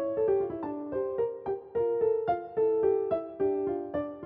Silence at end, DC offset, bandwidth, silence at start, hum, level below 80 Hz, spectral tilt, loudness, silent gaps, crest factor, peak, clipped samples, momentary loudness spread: 0 s; under 0.1%; 3.8 kHz; 0 s; none; -62 dBFS; -7.5 dB/octave; -30 LUFS; none; 14 dB; -16 dBFS; under 0.1%; 7 LU